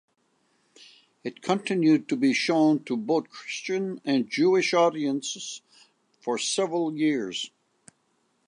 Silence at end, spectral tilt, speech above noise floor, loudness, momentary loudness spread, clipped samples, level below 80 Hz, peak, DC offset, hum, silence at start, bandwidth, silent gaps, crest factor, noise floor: 1 s; -4.5 dB/octave; 46 dB; -25 LUFS; 13 LU; under 0.1%; -82 dBFS; -10 dBFS; under 0.1%; none; 1.25 s; 10.5 kHz; none; 18 dB; -71 dBFS